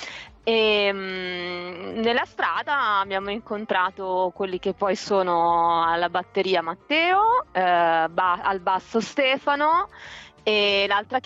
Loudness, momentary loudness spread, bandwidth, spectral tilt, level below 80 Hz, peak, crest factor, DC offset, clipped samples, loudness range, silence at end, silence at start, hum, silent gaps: -23 LUFS; 10 LU; 8 kHz; -4 dB/octave; -58 dBFS; -10 dBFS; 14 dB; under 0.1%; under 0.1%; 4 LU; 0.05 s; 0 s; none; none